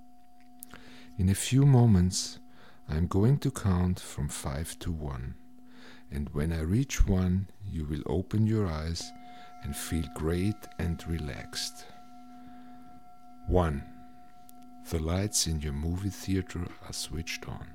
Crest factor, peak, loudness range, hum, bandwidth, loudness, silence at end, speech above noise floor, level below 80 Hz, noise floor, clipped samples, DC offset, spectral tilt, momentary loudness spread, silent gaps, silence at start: 20 dB; -10 dBFS; 9 LU; none; 16.5 kHz; -30 LUFS; 0 s; 29 dB; -40 dBFS; -58 dBFS; under 0.1%; 0.4%; -5.5 dB/octave; 23 LU; none; 0.75 s